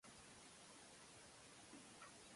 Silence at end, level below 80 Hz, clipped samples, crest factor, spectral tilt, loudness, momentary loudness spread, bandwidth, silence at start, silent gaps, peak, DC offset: 0 s; -82 dBFS; under 0.1%; 16 dB; -2 dB/octave; -61 LUFS; 1 LU; 11.5 kHz; 0.05 s; none; -48 dBFS; under 0.1%